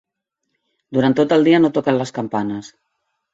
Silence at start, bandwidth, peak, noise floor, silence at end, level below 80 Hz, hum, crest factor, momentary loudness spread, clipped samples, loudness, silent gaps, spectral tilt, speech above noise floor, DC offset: 0.9 s; 7.8 kHz; -2 dBFS; -77 dBFS; 0.65 s; -60 dBFS; none; 16 dB; 11 LU; under 0.1%; -17 LUFS; none; -6.5 dB/octave; 60 dB; under 0.1%